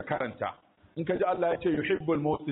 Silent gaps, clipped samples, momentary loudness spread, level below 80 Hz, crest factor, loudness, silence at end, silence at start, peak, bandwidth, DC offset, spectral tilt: none; under 0.1%; 9 LU; -60 dBFS; 14 dB; -30 LUFS; 0 s; 0 s; -16 dBFS; 4 kHz; under 0.1%; -5.5 dB/octave